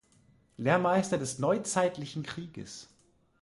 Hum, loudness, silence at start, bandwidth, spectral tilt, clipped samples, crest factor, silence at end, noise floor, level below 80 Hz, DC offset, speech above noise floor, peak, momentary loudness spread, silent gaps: none; -30 LUFS; 0.6 s; 11.5 kHz; -5 dB/octave; under 0.1%; 20 dB; 0.55 s; -64 dBFS; -66 dBFS; under 0.1%; 34 dB; -12 dBFS; 17 LU; none